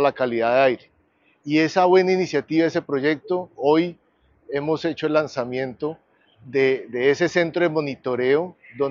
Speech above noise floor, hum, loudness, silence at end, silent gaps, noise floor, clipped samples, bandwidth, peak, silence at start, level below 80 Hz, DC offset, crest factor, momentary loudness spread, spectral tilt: 41 dB; none; -21 LUFS; 0 s; none; -62 dBFS; under 0.1%; 7.4 kHz; -4 dBFS; 0 s; -66 dBFS; under 0.1%; 18 dB; 10 LU; -4.5 dB/octave